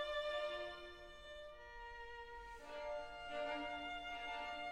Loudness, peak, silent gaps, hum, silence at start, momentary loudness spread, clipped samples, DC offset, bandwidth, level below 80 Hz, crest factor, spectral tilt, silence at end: -47 LUFS; -32 dBFS; none; none; 0 s; 12 LU; under 0.1%; under 0.1%; 14 kHz; -64 dBFS; 14 dB; -3 dB/octave; 0 s